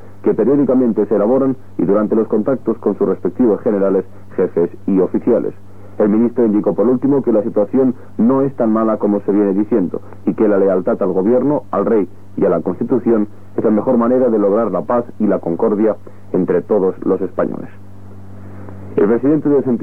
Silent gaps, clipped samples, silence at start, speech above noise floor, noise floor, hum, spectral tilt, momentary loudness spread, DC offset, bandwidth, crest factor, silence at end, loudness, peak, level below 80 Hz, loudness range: none; under 0.1%; 0.05 s; 21 dB; -36 dBFS; none; -11 dB/octave; 6 LU; 2%; 3.3 kHz; 12 dB; 0 s; -15 LUFS; -4 dBFS; -56 dBFS; 3 LU